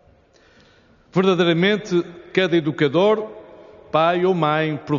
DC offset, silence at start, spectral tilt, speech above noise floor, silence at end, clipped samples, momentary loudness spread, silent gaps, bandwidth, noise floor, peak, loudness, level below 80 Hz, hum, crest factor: under 0.1%; 1.15 s; -4.5 dB/octave; 35 dB; 0 s; under 0.1%; 7 LU; none; 7.2 kHz; -54 dBFS; -4 dBFS; -19 LUFS; -62 dBFS; none; 16 dB